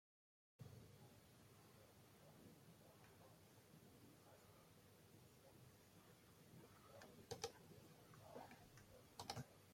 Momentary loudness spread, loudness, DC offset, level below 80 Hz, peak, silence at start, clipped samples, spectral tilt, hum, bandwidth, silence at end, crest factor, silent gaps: 14 LU; -63 LUFS; under 0.1%; -84 dBFS; -32 dBFS; 0.6 s; under 0.1%; -4 dB/octave; none; 16.5 kHz; 0 s; 32 dB; none